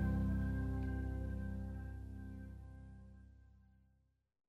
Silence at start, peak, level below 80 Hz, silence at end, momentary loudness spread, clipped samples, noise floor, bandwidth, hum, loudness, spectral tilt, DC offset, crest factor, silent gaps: 0 s; -28 dBFS; -46 dBFS; 0.9 s; 20 LU; under 0.1%; -77 dBFS; 4.4 kHz; none; -43 LUFS; -9.5 dB/octave; under 0.1%; 14 dB; none